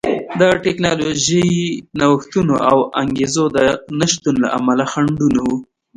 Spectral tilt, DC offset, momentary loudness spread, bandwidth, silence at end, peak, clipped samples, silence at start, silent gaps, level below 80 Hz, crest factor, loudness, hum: -4.5 dB/octave; under 0.1%; 4 LU; 11 kHz; 0.35 s; 0 dBFS; under 0.1%; 0.05 s; none; -46 dBFS; 16 dB; -16 LUFS; none